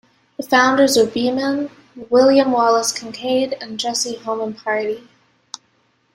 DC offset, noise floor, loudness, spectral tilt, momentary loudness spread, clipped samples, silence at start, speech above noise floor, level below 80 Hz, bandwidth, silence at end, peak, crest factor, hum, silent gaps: under 0.1%; -62 dBFS; -17 LUFS; -2.5 dB/octave; 19 LU; under 0.1%; 0.4 s; 45 dB; -62 dBFS; 16 kHz; 1.15 s; -2 dBFS; 16 dB; none; none